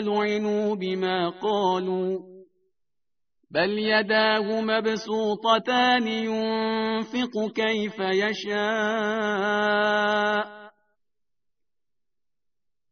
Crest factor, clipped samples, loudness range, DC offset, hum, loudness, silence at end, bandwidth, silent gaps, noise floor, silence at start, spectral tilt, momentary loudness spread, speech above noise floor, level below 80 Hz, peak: 20 dB; under 0.1%; 5 LU; under 0.1%; none; -24 LUFS; 2.2 s; 6.6 kHz; none; -87 dBFS; 0 s; -2 dB/octave; 6 LU; 63 dB; -68 dBFS; -6 dBFS